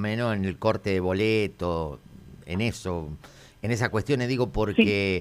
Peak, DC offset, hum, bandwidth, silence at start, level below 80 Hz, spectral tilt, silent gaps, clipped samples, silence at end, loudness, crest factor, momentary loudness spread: -6 dBFS; under 0.1%; none; 15 kHz; 0 s; -46 dBFS; -6.5 dB/octave; none; under 0.1%; 0 s; -26 LUFS; 20 dB; 14 LU